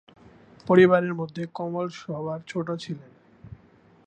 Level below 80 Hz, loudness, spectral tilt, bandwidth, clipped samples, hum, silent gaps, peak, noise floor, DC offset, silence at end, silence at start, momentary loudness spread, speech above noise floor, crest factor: -62 dBFS; -24 LUFS; -7.5 dB/octave; 8.4 kHz; under 0.1%; none; none; -4 dBFS; -56 dBFS; under 0.1%; 0.5 s; 0.65 s; 18 LU; 32 dB; 22 dB